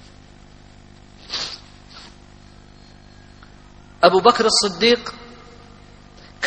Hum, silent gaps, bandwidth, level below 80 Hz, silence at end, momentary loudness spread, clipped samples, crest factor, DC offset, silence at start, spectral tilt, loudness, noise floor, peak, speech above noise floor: 50 Hz at -50 dBFS; none; 8.8 kHz; -50 dBFS; 0 s; 28 LU; under 0.1%; 22 dB; under 0.1%; 1.3 s; -2.5 dB/octave; -17 LUFS; -45 dBFS; 0 dBFS; 29 dB